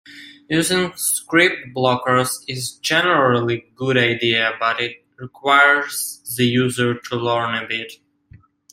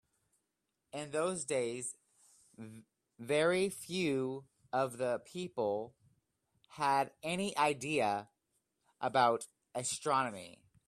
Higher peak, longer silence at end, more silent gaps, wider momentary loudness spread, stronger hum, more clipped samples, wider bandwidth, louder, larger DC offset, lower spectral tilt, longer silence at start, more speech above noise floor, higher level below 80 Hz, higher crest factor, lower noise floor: first, -2 dBFS vs -16 dBFS; first, 0.8 s vs 0.35 s; neither; second, 11 LU vs 18 LU; neither; neither; first, 16 kHz vs 14.5 kHz; first, -18 LUFS vs -35 LUFS; neither; about the same, -3.5 dB/octave vs -4 dB/octave; second, 0.1 s vs 0.95 s; second, 31 dB vs 51 dB; first, -60 dBFS vs -78 dBFS; about the same, 18 dB vs 22 dB; second, -49 dBFS vs -86 dBFS